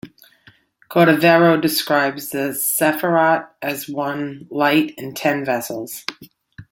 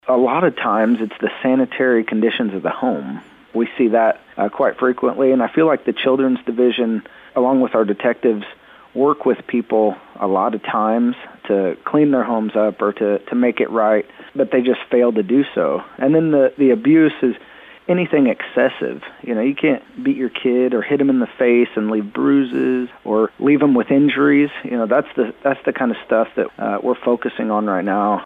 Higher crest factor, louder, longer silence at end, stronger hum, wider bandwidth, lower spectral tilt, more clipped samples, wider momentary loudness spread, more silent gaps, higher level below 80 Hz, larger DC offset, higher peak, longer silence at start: about the same, 16 dB vs 12 dB; about the same, -18 LUFS vs -17 LUFS; about the same, 0.1 s vs 0 s; neither; first, 17 kHz vs 4 kHz; second, -4.5 dB/octave vs -9 dB/octave; neither; first, 14 LU vs 7 LU; neither; about the same, -64 dBFS vs -62 dBFS; neither; about the same, -2 dBFS vs -4 dBFS; about the same, 0.05 s vs 0.05 s